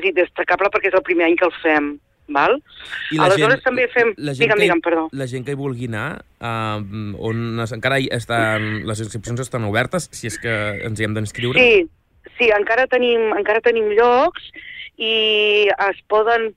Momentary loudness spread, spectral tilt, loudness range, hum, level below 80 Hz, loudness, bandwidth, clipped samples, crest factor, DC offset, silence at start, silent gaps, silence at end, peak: 12 LU; -5 dB/octave; 6 LU; none; -50 dBFS; -18 LUFS; 14 kHz; under 0.1%; 16 dB; under 0.1%; 0 s; none; 0.05 s; -2 dBFS